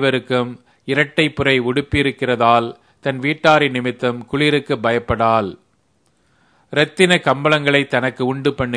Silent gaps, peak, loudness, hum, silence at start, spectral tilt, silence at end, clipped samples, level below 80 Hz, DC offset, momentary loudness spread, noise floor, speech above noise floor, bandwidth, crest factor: none; 0 dBFS; -17 LUFS; none; 0 s; -5.5 dB/octave; 0 s; under 0.1%; -44 dBFS; under 0.1%; 8 LU; -62 dBFS; 45 dB; 10.5 kHz; 18 dB